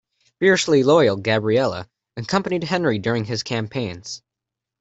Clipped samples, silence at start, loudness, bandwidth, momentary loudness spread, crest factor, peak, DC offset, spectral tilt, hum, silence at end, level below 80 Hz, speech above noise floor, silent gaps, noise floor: under 0.1%; 0.4 s; -20 LUFS; 8.2 kHz; 18 LU; 18 dB; -4 dBFS; under 0.1%; -5 dB/octave; none; 0.65 s; -58 dBFS; 66 dB; none; -85 dBFS